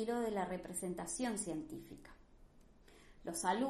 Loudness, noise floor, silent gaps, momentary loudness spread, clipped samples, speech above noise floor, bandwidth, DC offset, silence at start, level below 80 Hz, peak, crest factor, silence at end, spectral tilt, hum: -41 LUFS; -63 dBFS; none; 16 LU; under 0.1%; 23 dB; 13 kHz; under 0.1%; 0 s; -64 dBFS; -22 dBFS; 20 dB; 0 s; -4 dB/octave; none